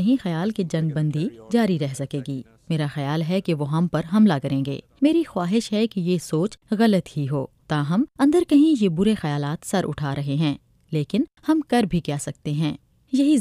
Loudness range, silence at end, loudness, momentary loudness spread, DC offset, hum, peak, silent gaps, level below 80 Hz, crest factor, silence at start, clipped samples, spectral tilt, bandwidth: 4 LU; 0 s; -23 LUFS; 9 LU; under 0.1%; none; -6 dBFS; none; -54 dBFS; 16 dB; 0 s; under 0.1%; -7 dB/octave; 14.5 kHz